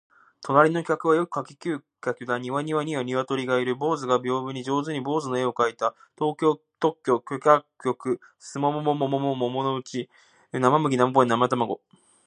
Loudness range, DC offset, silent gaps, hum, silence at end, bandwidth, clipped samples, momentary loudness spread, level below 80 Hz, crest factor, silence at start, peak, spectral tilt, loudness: 2 LU; under 0.1%; none; none; 0.5 s; 10 kHz; under 0.1%; 11 LU; -76 dBFS; 22 dB; 0.4 s; -4 dBFS; -6 dB/octave; -25 LUFS